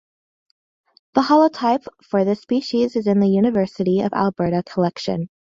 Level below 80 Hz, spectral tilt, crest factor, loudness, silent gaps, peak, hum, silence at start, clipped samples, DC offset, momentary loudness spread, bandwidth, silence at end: -58 dBFS; -7.5 dB/octave; 18 dB; -19 LUFS; none; -2 dBFS; none; 1.15 s; under 0.1%; under 0.1%; 8 LU; 7.6 kHz; 0.35 s